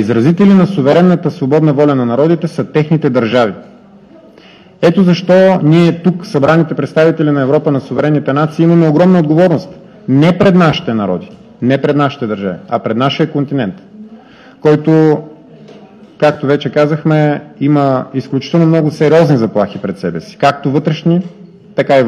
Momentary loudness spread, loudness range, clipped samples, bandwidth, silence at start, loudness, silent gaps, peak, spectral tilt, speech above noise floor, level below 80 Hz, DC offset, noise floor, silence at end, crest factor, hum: 10 LU; 4 LU; under 0.1%; 7.8 kHz; 0 s; -11 LUFS; none; 0 dBFS; -8 dB/octave; 29 dB; -52 dBFS; under 0.1%; -40 dBFS; 0 s; 12 dB; none